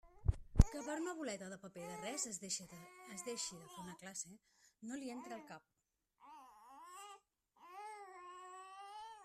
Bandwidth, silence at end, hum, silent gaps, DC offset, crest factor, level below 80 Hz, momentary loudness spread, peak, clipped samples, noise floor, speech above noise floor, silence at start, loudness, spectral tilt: 14.5 kHz; 0 s; none; none; under 0.1%; 32 dB; -46 dBFS; 19 LU; -10 dBFS; under 0.1%; -79 dBFS; 31 dB; 0.05 s; -44 LUFS; -4.5 dB/octave